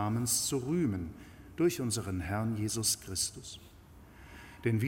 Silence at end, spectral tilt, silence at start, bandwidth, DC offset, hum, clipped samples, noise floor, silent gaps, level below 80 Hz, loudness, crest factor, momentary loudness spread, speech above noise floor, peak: 0 s; -4 dB/octave; 0 s; 17 kHz; under 0.1%; none; under 0.1%; -55 dBFS; none; -56 dBFS; -32 LUFS; 16 dB; 20 LU; 22 dB; -16 dBFS